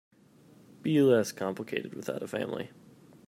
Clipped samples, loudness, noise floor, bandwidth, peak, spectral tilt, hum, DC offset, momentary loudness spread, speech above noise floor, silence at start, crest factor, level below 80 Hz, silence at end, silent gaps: under 0.1%; -30 LUFS; -58 dBFS; 16 kHz; -12 dBFS; -6 dB/octave; none; under 0.1%; 14 LU; 29 dB; 0.85 s; 20 dB; -76 dBFS; 0.6 s; none